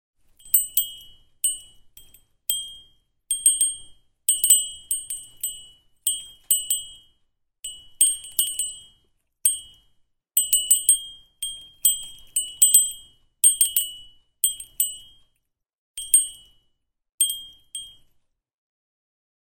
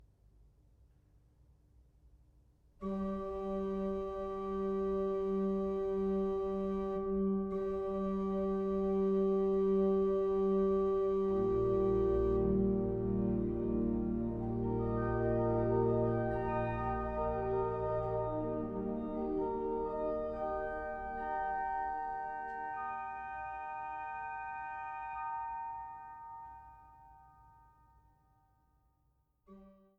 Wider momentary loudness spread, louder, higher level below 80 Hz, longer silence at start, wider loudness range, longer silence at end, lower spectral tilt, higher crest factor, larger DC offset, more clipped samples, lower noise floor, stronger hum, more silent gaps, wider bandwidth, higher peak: first, 20 LU vs 10 LU; first, -21 LUFS vs -35 LUFS; second, -60 dBFS vs -50 dBFS; second, 0.45 s vs 2.8 s; second, 6 LU vs 12 LU; first, 1.65 s vs 0.25 s; second, 4.5 dB/octave vs -10 dB/octave; first, 26 dB vs 14 dB; neither; neither; about the same, -75 dBFS vs -75 dBFS; neither; first, 15.78-15.94 s, 17.14-17.18 s vs none; first, 17.5 kHz vs 4.9 kHz; first, 0 dBFS vs -22 dBFS